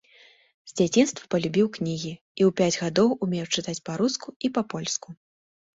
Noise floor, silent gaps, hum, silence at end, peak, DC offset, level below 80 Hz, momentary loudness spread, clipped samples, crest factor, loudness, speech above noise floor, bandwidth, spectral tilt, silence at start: -56 dBFS; 2.21-2.35 s, 4.36-4.40 s; none; 0.6 s; -8 dBFS; under 0.1%; -64 dBFS; 9 LU; under 0.1%; 18 dB; -25 LUFS; 31 dB; 8 kHz; -4.5 dB/octave; 0.65 s